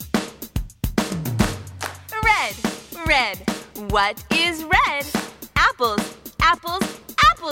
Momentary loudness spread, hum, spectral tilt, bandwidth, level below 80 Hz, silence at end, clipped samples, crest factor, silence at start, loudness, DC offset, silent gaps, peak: 12 LU; none; -3.5 dB/octave; 18.5 kHz; -36 dBFS; 0 s; under 0.1%; 20 dB; 0 s; -21 LUFS; under 0.1%; none; -2 dBFS